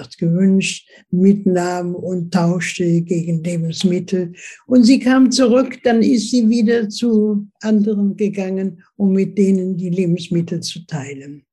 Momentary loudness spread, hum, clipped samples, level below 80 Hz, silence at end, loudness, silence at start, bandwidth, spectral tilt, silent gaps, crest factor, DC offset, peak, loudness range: 11 LU; none; under 0.1%; -62 dBFS; 0.15 s; -16 LUFS; 0 s; 12 kHz; -6 dB/octave; none; 16 dB; under 0.1%; 0 dBFS; 5 LU